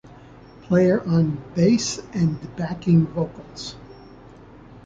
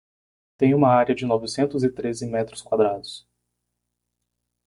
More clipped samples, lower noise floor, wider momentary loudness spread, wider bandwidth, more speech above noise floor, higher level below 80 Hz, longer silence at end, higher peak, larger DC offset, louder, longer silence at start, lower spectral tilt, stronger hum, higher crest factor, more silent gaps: neither; second, -45 dBFS vs -80 dBFS; first, 16 LU vs 12 LU; second, 7.8 kHz vs 11.5 kHz; second, 24 dB vs 58 dB; first, -50 dBFS vs -60 dBFS; second, 0.05 s vs 1.5 s; about the same, -6 dBFS vs -4 dBFS; neither; about the same, -21 LUFS vs -22 LUFS; about the same, 0.7 s vs 0.6 s; about the same, -6.5 dB/octave vs -6.5 dB/octave; second, none vs 60 Hz at -45 dBFS; about the same, 16 dB vs 18 dB; neither